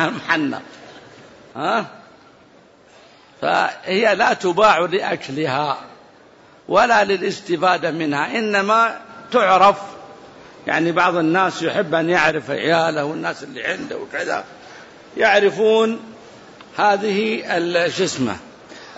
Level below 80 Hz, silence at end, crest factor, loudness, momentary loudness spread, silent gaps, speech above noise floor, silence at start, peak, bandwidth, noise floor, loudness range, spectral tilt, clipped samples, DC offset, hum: -60 dBFS; 0 s; 16 dB; -18 LUFS; 14 LU; none; 31 dB; 0 s; -4 dBFS; 8 kHz; -49 dBFS; 4 LU; -4.5 dB/octave; under 0.1%; under 0.1%; none